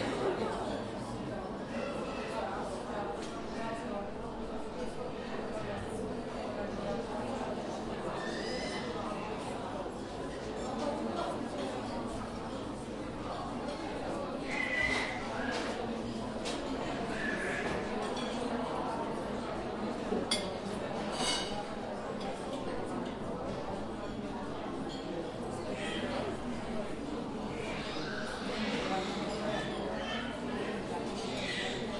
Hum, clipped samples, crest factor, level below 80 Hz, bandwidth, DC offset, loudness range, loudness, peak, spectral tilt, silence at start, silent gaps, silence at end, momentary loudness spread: none; under 0.1%; 20 dB; -54 dBFS; 11.5 kHz; under 0.1%; 4 LU; -37 LUFS; -16 dBFS; -4.5 dB/octave; 0 s; none; 0 s; 6 LU